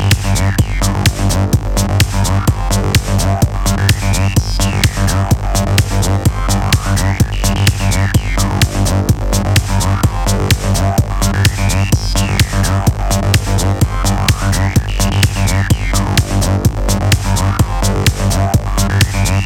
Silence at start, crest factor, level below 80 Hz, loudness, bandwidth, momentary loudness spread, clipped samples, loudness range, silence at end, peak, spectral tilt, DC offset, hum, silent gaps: 0 s; 12 dB; -20 dBFS; -14 LUFS; 18.5 kHz; 2 LU; under 0.1%; 0 LU; 0 s; 0 dBFS; -4.5 dB/octave; under 0.1%; none; none